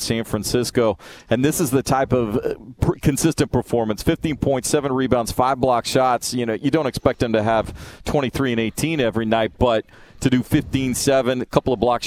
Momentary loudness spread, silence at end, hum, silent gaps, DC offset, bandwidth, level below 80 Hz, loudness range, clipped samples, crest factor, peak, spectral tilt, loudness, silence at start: 5 LU; 0 s; none; none; under 0.1%; 16.5 kHz; -38 dBFS; 1 LU; under 0.1%; 20 dB; 0 dBFS; -5 dB/octave; -20 LUFS; 0 s